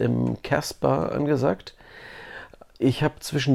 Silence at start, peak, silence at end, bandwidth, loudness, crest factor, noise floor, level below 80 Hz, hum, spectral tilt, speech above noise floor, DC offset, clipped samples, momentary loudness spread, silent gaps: 0 s; -8 dBFS; 0 s; 15.5 kHz; -25 LUFS; 18 dB; -44 dBFS; -50 dBFS; none; -6 dB/octave; 20 dB; under 0.1%; under 0.1%; 19 LU; none